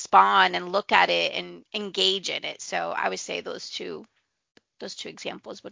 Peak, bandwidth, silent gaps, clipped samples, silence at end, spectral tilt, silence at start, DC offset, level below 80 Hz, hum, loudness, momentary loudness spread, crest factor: -2 dBFS; 7.8 kHz; none; under 0.1%; 0 s; -2 dB/octave; 0 s; under 0.1%; -70 dBFS; none; -24 LUFS; 17 LU; 24 dB